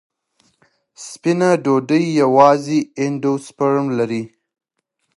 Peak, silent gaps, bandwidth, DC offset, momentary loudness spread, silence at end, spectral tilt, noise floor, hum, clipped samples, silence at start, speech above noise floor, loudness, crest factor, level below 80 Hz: 0 dBFS; none; 11.5 kHz; under 0.1%; 13 LU; 0.9 s; -6.5 dB/octave; -73 dBFS; none; under 0.1%; 1 s; 57 dB; -17 LUFS; 18 dB; -68 dBFS